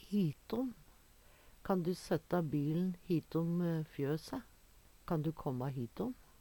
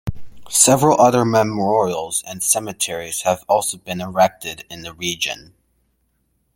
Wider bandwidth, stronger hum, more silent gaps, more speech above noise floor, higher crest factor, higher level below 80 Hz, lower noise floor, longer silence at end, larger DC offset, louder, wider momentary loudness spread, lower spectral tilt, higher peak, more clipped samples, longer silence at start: about the same, 18.5 kHz vs 17 kHz; neither; neither; second, 26 dB vs 48 dB; about the same, 16 dB vs 20 dB; second, -64 dBFS vs -48 dBFS; second, -63 dBFS vs -67 dBFS; second, 0.3 s vs 1.15 s; neither; second, -38 LUFS vs -17 LUFS; second, 8 LU vs 16 LU; first, -8 dB/octave vs -3.5 dB/octave; second, -22 dBFS vs 0 dBFS; neither; about the same, 0 s vs 0.05 s